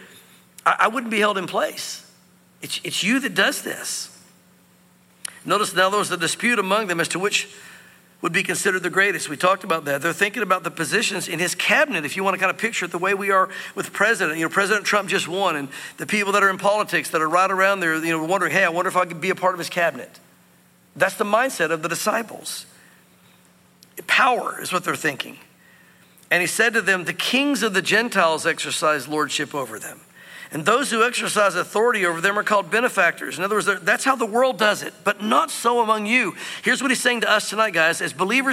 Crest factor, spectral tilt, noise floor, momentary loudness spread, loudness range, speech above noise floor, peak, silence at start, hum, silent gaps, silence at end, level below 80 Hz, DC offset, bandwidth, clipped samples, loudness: 18 dB; -2.5 dB/octave; -55 dBFS; 10 LU; 4 LU; 34 dB; -4 dBFS; 0 s; none; none; 0 s; -76 dBFS; under 0.1%; 16.5 kHz; under 0.1%; -20 LUFS